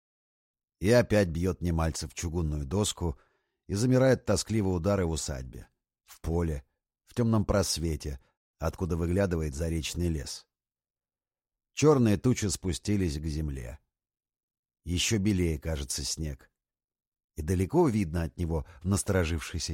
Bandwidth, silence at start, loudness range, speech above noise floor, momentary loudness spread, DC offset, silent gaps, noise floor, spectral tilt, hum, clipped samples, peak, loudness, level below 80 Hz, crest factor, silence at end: 16.5 kHz; 0.8 s; 3 LU; over 62 dB; 15 LU; under 0.1%; 8.37-8.54 s, 14.43-14.48 s, 14.59-14.63 s, 16.84-16.88 s, 17.07-17.12 s, 17.24-17.28 s; under -90 dBFS; -5.5 dB/octave; none; under 0.1%; -10 dBFS; -29 LUFS; -42 dBFS; 20 dB; 0 s